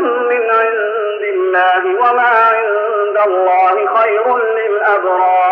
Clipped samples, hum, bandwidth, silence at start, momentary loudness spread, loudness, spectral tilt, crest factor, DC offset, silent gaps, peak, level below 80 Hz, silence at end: under 0.1%; none; 5.4 kHz; 0 s; 5 LU; -12 LUFS; -4 dB/octave; 10 dB; under 0.1%; none; -2 dBFS; -76 dBFS; 0 s